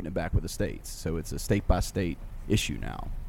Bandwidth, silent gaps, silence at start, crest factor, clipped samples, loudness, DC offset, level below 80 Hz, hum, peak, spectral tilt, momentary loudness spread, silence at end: 17 kHz; none; 0 s; 20 dB; under 0.1%; -31 LUFS; under 0.1%; -34 dBFS; none; -10 dBFS; -5.5 dB/octave; 9 LU; 0 s